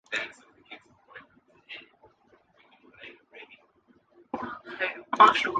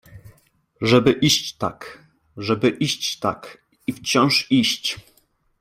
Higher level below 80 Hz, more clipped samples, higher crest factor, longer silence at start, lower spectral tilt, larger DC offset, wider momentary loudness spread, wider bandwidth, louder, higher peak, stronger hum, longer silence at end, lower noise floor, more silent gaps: second, -72 dBFS vs -56 dBFS; neither; about the same, 26 dB vs 22 dB; about the same, 0.1 s vs 0.1 s; second, -2.5 dB/octave vs -4 dB/octave; neither; first, 31 LU vs 15 LU; second, 9.4 kHz vs 16 kHz; second, -26 LUFS vs -20 LUFS; about the same, -4 dBFS vs -2 dBFS; neither; second, 0 s vs 0.6 s; about the same, -64 dBFS vs -62 dBFS; neither